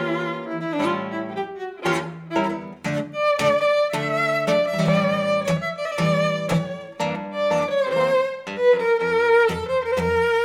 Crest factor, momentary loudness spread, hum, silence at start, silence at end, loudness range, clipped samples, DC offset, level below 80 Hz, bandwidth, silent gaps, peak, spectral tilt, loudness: 14 dB; 9 LU; none; 0 s; 0 s; 3 LU; under 0.1%; under 0.1%; -54 dBFS; 15.5 kHz; none; -8 dBFS; -5.5 dB/octave; -22 LUFS